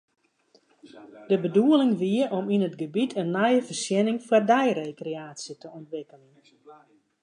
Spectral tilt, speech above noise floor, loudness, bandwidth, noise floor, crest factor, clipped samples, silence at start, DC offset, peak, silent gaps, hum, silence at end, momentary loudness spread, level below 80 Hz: -5.5 dB/octave; 39 dB; -24 LUFS; 11 kHz; -64 dBFS; 18 dB; under 0.1%; 0.95 s; under 0.1%; -8 dBFS; none; none; 0.5 s; 18 LU; -80 dBFS